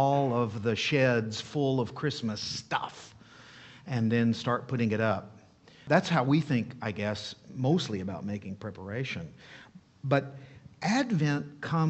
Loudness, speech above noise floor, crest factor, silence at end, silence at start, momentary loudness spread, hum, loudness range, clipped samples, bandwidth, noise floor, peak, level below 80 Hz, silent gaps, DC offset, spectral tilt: -30 LUFS; 27 dB; 22 dB; 0 s; 0 s; 15 LU; none; 5 LU; under 0.1%; 8.4 kHz; -56 dBFS; -8 dBFS; -66 dBFS; none; under 0.1%; -6 dB/octave